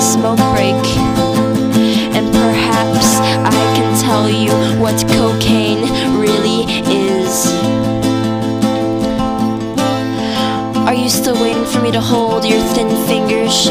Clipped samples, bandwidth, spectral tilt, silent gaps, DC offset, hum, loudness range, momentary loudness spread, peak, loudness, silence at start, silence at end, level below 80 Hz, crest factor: under 0.1%; 16 kHz; -4.5 dB/octave; none; under 0.1%; none; 3 LU; 4 LU; 0 dBFS; -13 LUFS; 0 s; 0 s; -36 dBFS; 12 dB